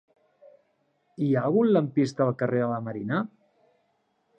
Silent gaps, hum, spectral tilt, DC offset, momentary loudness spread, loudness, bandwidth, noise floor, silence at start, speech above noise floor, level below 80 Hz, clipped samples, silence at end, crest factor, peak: none; none; -8.5 dB/octave; under 0.1%; 9 LU; -26 LUFS; 9 kHz; -72 dBFS; 1.2 s; 47 dB; -74 dBFS; under 0.1%; 1.1 s; 18 dB; -10 dBFS